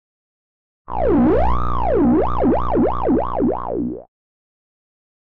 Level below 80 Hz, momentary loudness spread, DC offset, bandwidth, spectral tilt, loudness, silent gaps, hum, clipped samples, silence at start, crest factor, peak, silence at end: -30 dBFS; 9 LU; 5%; 4.8 kHz; -10.5 dB/octave; -18 LUFS; none; 60 Hz at -25 dBFS; under 0.1%; 0.85 s; 10 dB; -10 dBFS; 1.15 s